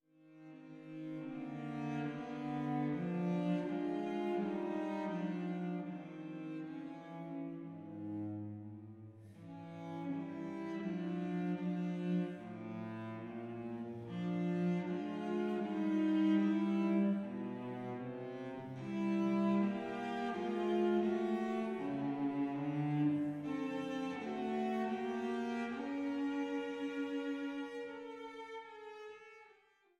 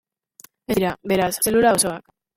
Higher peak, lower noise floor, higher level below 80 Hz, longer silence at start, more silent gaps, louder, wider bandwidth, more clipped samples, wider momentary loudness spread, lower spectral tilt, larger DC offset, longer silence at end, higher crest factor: second, -22 dBFS vs -4 dBFS; first, -69 dBFS vs -51 dBFS; second, -82 dBFS vs -50 dBFS; second, 0.25 s vs 0.7 s; neither; second, -39 LUFS vs -20 LUFS; second, 8.8 kHz vs 17 kHz; neither; about the same, 14 LU vs 13 LU; first, -8 dB/octave vs -3.5 dB/octave; neither; about the same, 0.45 s vs 0.35 s; about the same, 16 dB vs 18 dB